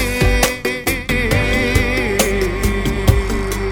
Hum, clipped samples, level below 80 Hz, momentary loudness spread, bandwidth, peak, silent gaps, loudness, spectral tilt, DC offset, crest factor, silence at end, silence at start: none; under 0.1%; -22 dBFS; 4 LU; 18.5 kHz; 0 dBFS; none; -17 LUFS; -4.5 dB/octave; under 0.1%; 16 dB; 0 s; 0 s